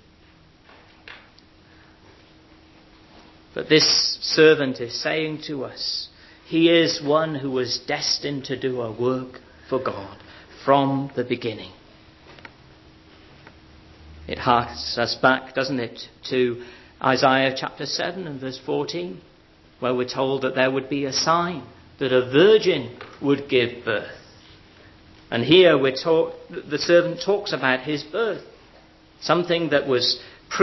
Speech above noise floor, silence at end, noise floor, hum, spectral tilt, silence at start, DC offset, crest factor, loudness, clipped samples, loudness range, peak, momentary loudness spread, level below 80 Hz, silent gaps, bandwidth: 31 dB; 0 s; -53 dBFS; none; -4.5 dB/octave; 1.05 s; under 0.1%; 22 dB; -21 LUFS; under 0.1%; 7 LU; -2 dBFS; 16 LU; -56 dBFS; none; 6.2 kHz